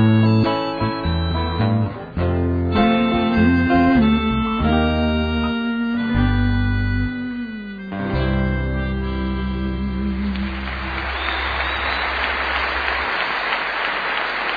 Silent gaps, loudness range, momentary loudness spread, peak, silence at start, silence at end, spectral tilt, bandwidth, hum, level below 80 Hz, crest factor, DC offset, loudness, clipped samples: none; 6 LU; 8 LU; -4 dBFS; 0 s; 0 s; -8.5 dB/octave; 5 kHz; none; -28 dBFS; 14 dB; under 0.1%; -20 LUFS; under 0.1%